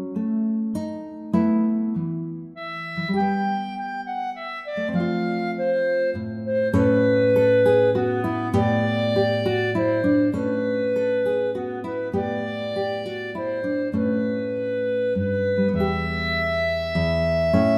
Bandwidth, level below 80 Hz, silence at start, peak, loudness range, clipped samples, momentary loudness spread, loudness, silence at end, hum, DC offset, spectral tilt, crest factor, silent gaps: 10.5 kHz; -46 dBFS; 0 s; -6 dBFS; 6 LU; under 0.1%; 11 LU; -23 LUFS; 0 s; none; under 0.1%; -8 dB/octave; 16 dB; none